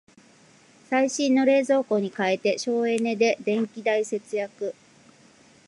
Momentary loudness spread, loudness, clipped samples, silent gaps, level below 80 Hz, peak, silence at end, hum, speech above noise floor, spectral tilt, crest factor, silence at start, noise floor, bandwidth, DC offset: 9 LU; -24 LUFS; under 0.1%; none; -78 dBFS; -8 dBFS; 0.95 s; none; 32 dB; -4.5 dB/octave; 16 dB; 0.9 s; -55 dBFS; 11.5 kHz; under 0.1%